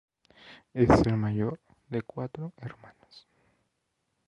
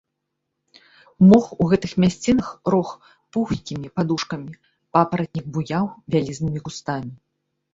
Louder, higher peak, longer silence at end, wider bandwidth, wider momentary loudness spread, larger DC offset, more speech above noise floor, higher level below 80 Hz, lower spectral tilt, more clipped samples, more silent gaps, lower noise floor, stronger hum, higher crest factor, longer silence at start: second, -28 LUFS vs -21 LUFS; second, -6 dBFS vs -2 dBFS; first, 1.1 s vs 0.6 s; first, 11 kHz vs 7.8 kHz; first, 21 LU vs 13 LU; neither; second, 51 dB vs 58 dB; about the same, -48 dBFS vs -52 dBFS; about the same, -8 dB/octave vs -7 dB/octave; neither; neither; about the same, -79 dBFS vs -78 dBFS; neither; about the same, 24 dB vs 20 dB; second, 0.45 s vs 1.2 s